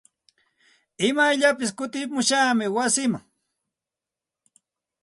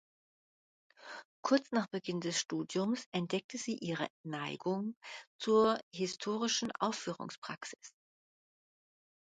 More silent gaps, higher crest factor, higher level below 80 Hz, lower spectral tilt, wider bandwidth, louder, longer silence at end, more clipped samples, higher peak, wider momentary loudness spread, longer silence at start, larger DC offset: second, none vs 1.25-1.43 s, 3.06-3.12 s, 3.44-3.49 s, 4.10-4.24 s, 4.97-5.01 s, 5.27-5.39 s, 5.83-5.91 s, 7.38-7.42 s; about the same, 20 dB vs 20 dB; first, -72 dBFS vs -80 dBFS; second, -2.5 dB/octave vs -4 dB/octave; first, 11.5 kHz vs 9.4 kHz; first, -22 LUFS vs -36 LUFS; first, 1.85 s vs 1.4 s; neither; first, -6 dBFS vs -16 dBFS; second, 9 LU vs 16 LU; about the same, 1 s vs 1 s; neither